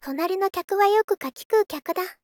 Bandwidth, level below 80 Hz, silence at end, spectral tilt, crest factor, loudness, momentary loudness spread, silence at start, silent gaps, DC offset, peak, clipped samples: 19 kHz; -68 dBFS; 0.1 s; -2.5 dB/octave; 14 dB; -23 LUFS; 9 LU; 0.05 s; 1.04-1.08 s, 1.45-1.50 s; under 0.1%; -8 dBFS; under 0.1%